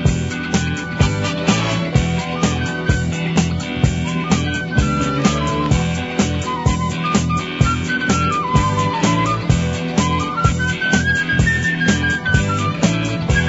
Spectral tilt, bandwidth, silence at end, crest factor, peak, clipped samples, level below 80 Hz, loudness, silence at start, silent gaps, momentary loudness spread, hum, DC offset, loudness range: -5 dB/octave; 8 kHz; 0 s; 16 dB; 0 dBFS; under 0.1%; -28 dBFS; -18 LUFS; 0 s; none; 3 LU; none; under 0.1%; 2 LU